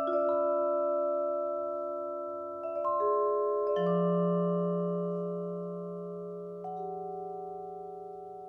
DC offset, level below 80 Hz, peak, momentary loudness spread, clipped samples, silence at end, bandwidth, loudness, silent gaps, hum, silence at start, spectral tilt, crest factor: under 0.1%; -74 dBFS; -18 dBFS; 12 LU; under 0.1%; 0 s; 3.5 kHz; -32 LUFS; none; none; 0 s; -10.5 dB/octave; 14 dB